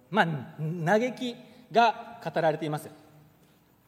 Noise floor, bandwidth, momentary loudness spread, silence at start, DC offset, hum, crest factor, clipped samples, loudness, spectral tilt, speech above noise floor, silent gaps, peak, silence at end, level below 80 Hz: -61 dBFS; 16 kHz; 13 LU; 0.1 s; under 0.1%; none; 22 dB; under 0.1%; -28 LUFS; -6 dB/octave; 34 dB; none; -6 dBFS; 0.95 s; -78 dBFS